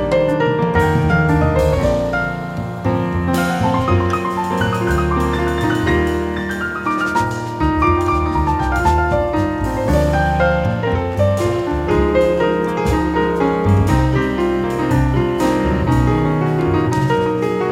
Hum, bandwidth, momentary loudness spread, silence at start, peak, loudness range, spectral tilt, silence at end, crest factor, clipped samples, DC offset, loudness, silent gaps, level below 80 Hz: none; 16 kHz; 5 LU; 0 s; -2 dBFS; 2 LU; -7 dB/octave; 0 s; 14 dB; under 0.1%; under 0.1%; -17 LUFS; none; -26 dBFS